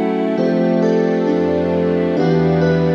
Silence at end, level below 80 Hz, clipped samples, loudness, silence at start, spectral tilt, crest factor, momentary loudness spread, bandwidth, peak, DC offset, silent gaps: 0 s; -46 dBFS; under 0.1%; -16 LUFS; 0 s; -8.5 dB/octave; 10 dB; 2 LU; 6.6 kHz; -4 dBFS; under 0.1%; none